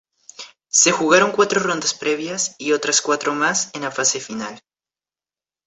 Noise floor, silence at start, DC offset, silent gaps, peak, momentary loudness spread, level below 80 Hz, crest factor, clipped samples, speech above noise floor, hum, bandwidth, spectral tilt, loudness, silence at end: under -90 dBFS; 0.4 s; under 0.1%; none; -2 dBFS; 15 LU; -66 dBFS; 20 dB; under 0.1%; over 71 dB; none; 8.4 kHz; -1.5 dB/octave; -18 LUFS; 1.1 s